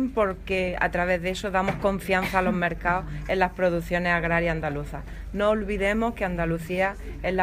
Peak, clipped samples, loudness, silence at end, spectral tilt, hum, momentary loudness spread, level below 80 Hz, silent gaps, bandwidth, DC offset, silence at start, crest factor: -6 dBFS; under 0.1%; -25 LUFS; 0 s; -6 dB/octave; none; 6 LU; -38 dBFS; none; 16 kHz; under 0.1%; 0 s; 18 dB